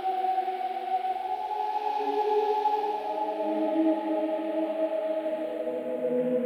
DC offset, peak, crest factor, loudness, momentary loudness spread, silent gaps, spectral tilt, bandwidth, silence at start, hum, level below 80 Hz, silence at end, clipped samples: under 0.1%; -14 dBFS; 14 dB; -29 LUFS; 6 LU; none; -6 dB/octave; 14.5 kHz; 0 s; none; -78 dBFS; 0 s; under 0.1%